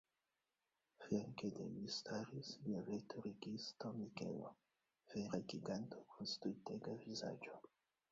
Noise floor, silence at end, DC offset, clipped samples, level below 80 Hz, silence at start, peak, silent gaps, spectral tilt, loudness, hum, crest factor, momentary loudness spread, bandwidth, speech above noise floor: under -90 dBFS; 0.45 s; under 0.1%; under 0.1%; -82 dBFS; 1 s; -28 dBFS; none; -5 dB/octave; -49 LUFS; none; 22 dB; 7 LU; 7.6 kHz; over 42 dB